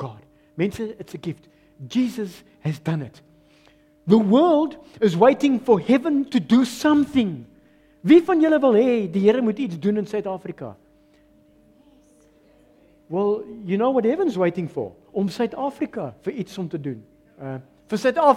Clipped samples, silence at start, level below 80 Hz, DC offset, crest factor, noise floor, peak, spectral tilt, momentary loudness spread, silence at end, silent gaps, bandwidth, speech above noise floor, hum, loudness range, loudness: under 0.1%; 0 s; -60 dBFS; under 0.1%; 20 dB; -56 dBFS; -2 dBFS; -7 dB/octave; 18 LU; 0 s; none; 15 kHz; 36 dB; none; 11 LU; -21 LUFS